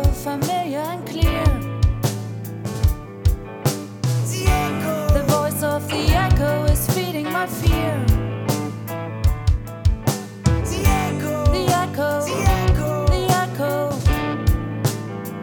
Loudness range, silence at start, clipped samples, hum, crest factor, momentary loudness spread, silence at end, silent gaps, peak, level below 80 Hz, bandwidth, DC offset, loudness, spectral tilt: 3 LU; 0 s; under 0.1%; none; 16 dB; 6 LU; 0 s; none; -2 dBFS; -26 dBFS; 20 kHz; under 0.1%; -21 LUFS; -5.5 dB/octave